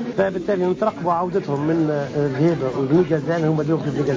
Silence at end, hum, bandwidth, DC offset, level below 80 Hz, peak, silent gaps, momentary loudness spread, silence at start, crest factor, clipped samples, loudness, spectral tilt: 0 s; none; 7.6 kHz; under 0.1%; -52 dBFS; -6 dBFS; none; 3 LU; 0 s; 12 dB; under 0.1%; -21 LUFS; -8.5 dB/octave